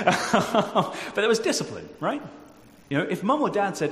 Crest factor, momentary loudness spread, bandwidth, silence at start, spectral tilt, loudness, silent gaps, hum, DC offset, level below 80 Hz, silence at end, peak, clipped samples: 22 dB; 8 LU; 15.5 kHz; 0 s; -4.5 dB/octave; -25 LUFS; none; none; under 0.1%; -62 dBFS; 0 s; -4 dBFS; under 0.1%